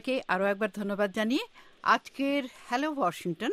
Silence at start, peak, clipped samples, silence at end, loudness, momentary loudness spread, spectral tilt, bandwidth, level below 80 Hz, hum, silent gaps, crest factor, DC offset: 0.05 s; -10 dBFS; under 0.1%; 0 s; -30 LUFS; 6 LU; -5 dB/octave; 15.5 kHz; -70 dBFS; none; none; 20 dB; under 0.1%